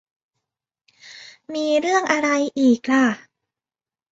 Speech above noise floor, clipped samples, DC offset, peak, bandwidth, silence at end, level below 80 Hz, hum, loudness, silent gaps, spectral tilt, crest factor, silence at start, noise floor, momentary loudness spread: over 71 dB; under 0.1%; under 0.1%; -4 dBFS; 8 kHz; 0.95 s; -68 dBFS; none; -19 LUFS; none; -3.5 dB/octave; 18 dB; 1.05 s; under -90 dBFS; 21 LU